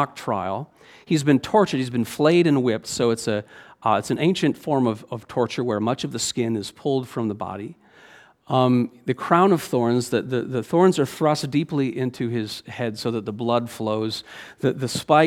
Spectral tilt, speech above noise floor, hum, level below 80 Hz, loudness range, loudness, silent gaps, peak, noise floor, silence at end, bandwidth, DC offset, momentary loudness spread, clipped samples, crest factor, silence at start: -5.5 dB/octave; 28 dB; none; -62 dBFS; 5 LU; -23 LUFS; none; -2 dBFS; -50 dBFS; 0 s; 16.5 kHz; under 0.1%; 10 LU; under 0.1%; 20 dB; 0 s